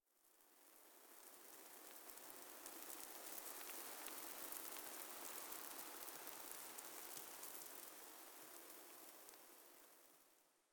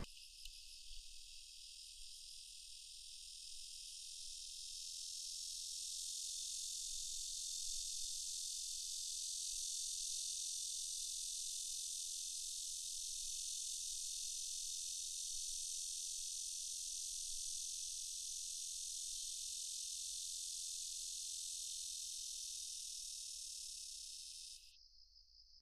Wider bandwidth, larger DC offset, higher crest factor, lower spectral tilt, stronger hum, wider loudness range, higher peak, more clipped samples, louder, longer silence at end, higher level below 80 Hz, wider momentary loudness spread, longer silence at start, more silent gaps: first, over 20 kHz vs 14.5 kHz; neither; first, 28 dB vs 18 dB; first, 0 dB/octave vs 3 dB/octave; neither; about the same, 6 LU vs 7 LU; about the same, -28 dBFS vs -30 dBFS; neither; second, -53 LUFS vs -44 LUFS; about the same, 0.1 s vs 0 s; second, under -90 dBFS vs -68 dBFS; about the same, 13 LU vs 11 LU; first, 0.15 s vs 0 s; neither